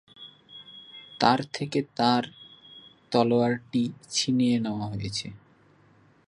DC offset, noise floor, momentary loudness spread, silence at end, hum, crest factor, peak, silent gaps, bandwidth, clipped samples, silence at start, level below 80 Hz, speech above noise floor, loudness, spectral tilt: under 0.1%; -59 dBFS; 23 LU; 0.9 s; none; 24 dB; -4 dBFS; none; 11 kHz; under 0.1%; 0.2 s; -62 dBFS; 34 dB; -26 LUFS; -5 dB/octave